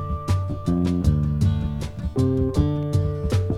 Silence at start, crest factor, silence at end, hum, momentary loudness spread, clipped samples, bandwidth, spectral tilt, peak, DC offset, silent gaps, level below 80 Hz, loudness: 0 s; 14 dB; 0 s; none; 5 LU; under 0.1%; 12 kHz; -8.5 dB/octave; -6 dBFS; under 0.1%; none; -30 dBFS; -23 LUFS